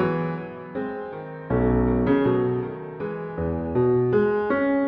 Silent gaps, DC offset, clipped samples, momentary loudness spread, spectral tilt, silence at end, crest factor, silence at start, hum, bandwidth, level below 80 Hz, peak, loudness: none; under 0.1%; under 0.1%; 12 LU; -11 dB/octave; 0 s; 14 dB; 0 s; none; 5.2 kHz; -38 dBFS; -8 dBFS; -24 LUFS